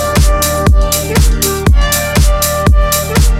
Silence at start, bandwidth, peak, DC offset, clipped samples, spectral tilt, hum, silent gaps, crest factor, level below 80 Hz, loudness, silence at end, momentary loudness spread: 0 s; 16.5 kHz; 0 dBFS; under 0.1%; under 0.1%; -4 dB/octave; none; none; 10 dB; -12 dBFS; -11 LUFS; 0 s; 1 LU